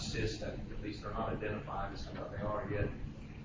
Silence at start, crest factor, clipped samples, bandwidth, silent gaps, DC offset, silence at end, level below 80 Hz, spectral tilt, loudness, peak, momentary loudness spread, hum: 0 s; 16 dB; under 0.1%; 7.6 kHz; none; under 0.1%; 0 s; -48 dBFS; -6 dB/octave; -40 LUFS; -22 dBFS; 6 LU; none